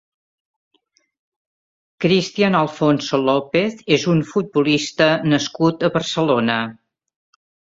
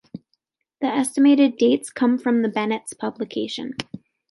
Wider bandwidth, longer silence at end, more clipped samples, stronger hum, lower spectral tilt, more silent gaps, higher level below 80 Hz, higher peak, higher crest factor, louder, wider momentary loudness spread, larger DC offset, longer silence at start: second, 7.8 kHz vs 11.5 kHz; first, 0.9 s vs 0.35 s; neither; neither; about the same, -5.5 dB/octave vs -4.5 dB/octave; neither; first, -58 dBFS vs -70 dBFS; about the same, -2 dBFS vs -4 dBFS; about the same, 18 dB vs 18 dB; first, -18 LUFS vs -21 LUFS; second, 4 LU vs 18 LU; neither; first, 2 s vs 0.15 s